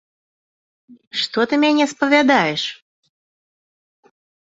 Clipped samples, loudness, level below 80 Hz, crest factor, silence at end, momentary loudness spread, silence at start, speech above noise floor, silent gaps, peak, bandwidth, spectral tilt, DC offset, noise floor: under 0.1%; -17 LUFS; -66 dBFS; 20 dB; 1.8 s; 11 LU; 0.9 s; over 73 dB; 1.07-1.11 s; 0 dBFS; 7.8 kHz; -4 dB/octave; under 0.1%; under -90 dBFS